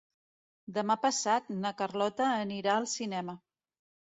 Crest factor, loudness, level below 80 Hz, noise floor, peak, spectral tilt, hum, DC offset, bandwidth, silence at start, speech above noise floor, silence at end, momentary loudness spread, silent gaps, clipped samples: 18 dB; -31 LUFS; -78 dBFS; under -90 dBFS; -14 dBFS; -3.5 dB/octave; none; under 0.1%; 8.4 kHz; 0.7 s; over 59 dB; 0.8 s; 9 LU; none; under 0.1%